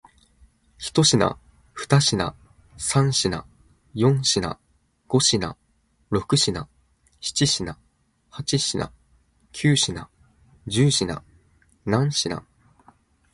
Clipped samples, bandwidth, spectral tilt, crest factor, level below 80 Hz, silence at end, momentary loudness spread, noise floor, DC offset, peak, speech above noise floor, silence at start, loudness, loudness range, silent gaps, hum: under 0.1%; 11.5 kHz; -4 dB/octave; 20 dB; -50 dBFS; 0.95 s; 17 LU; -65 dBFS; under 0.1%; -4 dBFS; 43 dB; 0.8 s; -22 LUFS; 4 LU; none; none